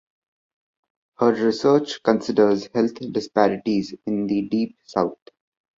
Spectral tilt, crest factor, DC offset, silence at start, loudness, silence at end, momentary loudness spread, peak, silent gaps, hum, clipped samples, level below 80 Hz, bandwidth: -6.5 dB/octave; 20 dB; under 0.1%; 1.2 s; -22 LUFS; 0.65 s; 7 LU; -2 dBFS; none; none; under 0.1%; -62 dBFS; 7.6 kHz